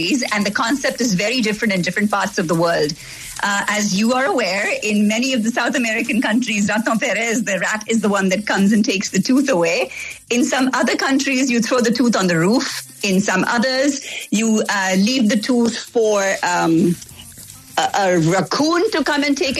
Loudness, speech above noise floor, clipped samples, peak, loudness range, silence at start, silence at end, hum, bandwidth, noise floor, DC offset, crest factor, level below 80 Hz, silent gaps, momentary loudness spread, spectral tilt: -17 LUFS; 21 dB; under 0.1%; -4 dBFS; 1 LU; 0 s; 0 s; none; 13.5 kHz; -39 dBFS; under 0.1%; 12 dB; -56 dBFS; none; 4 LU; -4 dB/octave